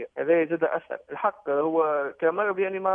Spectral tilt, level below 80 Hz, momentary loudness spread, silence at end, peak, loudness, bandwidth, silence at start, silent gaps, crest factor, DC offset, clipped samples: -9 dB/octave; -74 dBFS; 5 LU; 0 s; -10 dBFS; -25 LUFS; 3.6 kHz; 0 s; none; 16 dB; under 0.1%; under 0.1%